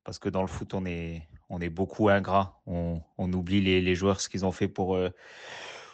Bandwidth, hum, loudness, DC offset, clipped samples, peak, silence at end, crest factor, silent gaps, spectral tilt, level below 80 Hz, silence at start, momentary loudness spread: 8.6 kHz; none; -29 LUFS; under 0.1%; under 0.1%; -10 dBFS; 0 s; 18 dB; none; -6 dB/octave; -52 dBFS; 0.05 s; 16 LU